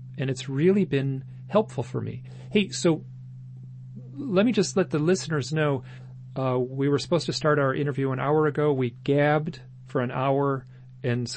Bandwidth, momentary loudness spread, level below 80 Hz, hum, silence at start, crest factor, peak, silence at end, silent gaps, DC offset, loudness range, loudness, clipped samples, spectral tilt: 8.8 kHz; 19 LU; -62 dBFS; none; 0 s; 18 dB; -8 dBFS; 0 s; none; under 0.1%; 3 LU; -25 LUFS; under 0.1%; -6 dB/octave